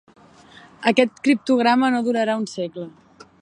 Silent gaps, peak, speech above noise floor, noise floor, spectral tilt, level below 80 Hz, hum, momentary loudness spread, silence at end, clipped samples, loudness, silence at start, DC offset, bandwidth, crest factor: none; -2 dBFS; 28 dB; -48 dBFS; -5 dB/octave; -70 dBFS; none; 13 LU; 0.5 s; under 0.1%; -20 LUFS; 0.8 s; under 0.1%; 10 kHz; 20 dB